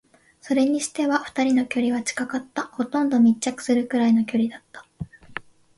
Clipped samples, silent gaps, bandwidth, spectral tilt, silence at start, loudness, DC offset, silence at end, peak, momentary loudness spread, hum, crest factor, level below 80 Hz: under 0.1%; none; 11.5 kHz; -4.5 dB/octave; 0.45 s; -22 LUFS; under 0.1%; 0.35 s; -8 dBFS; 18 LU; none; 16 dB; -60 dBFS